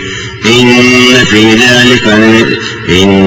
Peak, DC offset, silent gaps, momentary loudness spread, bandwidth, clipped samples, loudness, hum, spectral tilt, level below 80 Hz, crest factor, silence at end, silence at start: 0 dBFS; under 0.1%; none; 8 LU; 17.5 kHz; 3%; -4 LUFS; none; -4 dB/octave; -34 dBFS; 6 dB; 0 s; 0 s